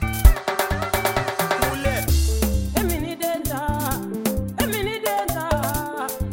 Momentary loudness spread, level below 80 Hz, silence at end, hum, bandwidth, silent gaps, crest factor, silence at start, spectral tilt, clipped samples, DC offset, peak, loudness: 5 LU; -26 dBFS; 0 s; none; 17.5 kHz; none; 22 dB; 0 s; -4.5 dB/octave; under 0.1%; under 0.1%; 0 dBFS; -23 LUFS